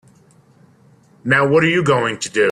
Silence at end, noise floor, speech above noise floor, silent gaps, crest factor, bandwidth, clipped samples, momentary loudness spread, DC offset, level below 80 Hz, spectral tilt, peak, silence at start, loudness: 0 s; -51 dBFS; 36 dB; none; 16 dB; 12 kHz; under 0.1%; 6 LU; under 0.1%; -58 dBFS; -5 dB/octave; -2 dBFS; 1.25 s; -15 LUFS